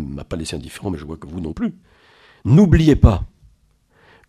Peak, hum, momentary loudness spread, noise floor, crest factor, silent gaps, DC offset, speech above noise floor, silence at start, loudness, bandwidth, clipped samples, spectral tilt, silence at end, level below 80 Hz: 0 dBFS; none; 17 LU; -58 dBFS; 18 dB; none; under 0.1%; 41 dB; 0 s; -18 LUFS; 13 kHz; under 0.1%; -8 dB/octave; 1 s; -28 dBFS